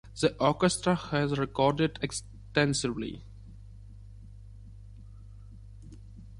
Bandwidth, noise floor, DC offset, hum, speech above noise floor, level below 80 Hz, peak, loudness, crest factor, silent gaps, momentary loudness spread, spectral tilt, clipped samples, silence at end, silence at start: 11.5 kHz; -47 dBFS; under 0.1%; 50 Hz at -45 dBFS; 20 dB; -50 dBFS; -10 dBFS; -29 LUFS; 22 dB; none; 24 LU; -5 dB/octave; under 0.1%; 0 s; 0.05 s